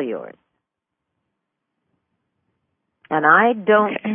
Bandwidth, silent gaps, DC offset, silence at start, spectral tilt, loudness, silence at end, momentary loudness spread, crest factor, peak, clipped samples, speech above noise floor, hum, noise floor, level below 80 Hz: 3.6 kHz; none; under 0.1%; 0 s; -10 dB/octave; -16 LUFS; 0 s; 14 LU; 20 dB; -2 dBFS; under 0.1%; 64 dB; none; -81 dBFS; -76 dBFS